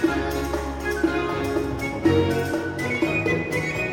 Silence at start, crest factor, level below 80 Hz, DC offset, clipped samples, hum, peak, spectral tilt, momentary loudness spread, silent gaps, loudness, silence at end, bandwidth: 0 s; 16 dB; -38 dBFS; under 0.1%; under 0.1%; none; -8 dBFS; -6 dB/octave; 6 LU; none; -24 LUFS; 0 s; 17 kHz